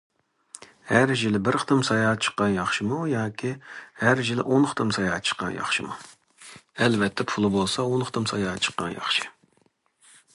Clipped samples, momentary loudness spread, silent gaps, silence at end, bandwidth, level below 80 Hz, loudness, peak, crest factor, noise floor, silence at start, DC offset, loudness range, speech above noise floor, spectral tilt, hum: under 0.1%; 13 LU; none; 1.05 s; 11.5 kHz; -58 dBFS; -24 LUFS; -2 dBFS; 22 dB; -66 dBFS; 0.85 s; under 0.1%; 2 LU; 42 dB; -4.5 dB/octave; none